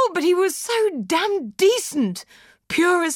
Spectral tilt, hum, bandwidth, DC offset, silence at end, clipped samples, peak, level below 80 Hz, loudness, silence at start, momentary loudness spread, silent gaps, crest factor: -3.5 dB/octave; none; 17 kHz; under 0.1%; 0 s; under 0.1%; -6 dBFS; -64 dBFS; -20 LUFS; 0 s; 7 LU; none; 14 dB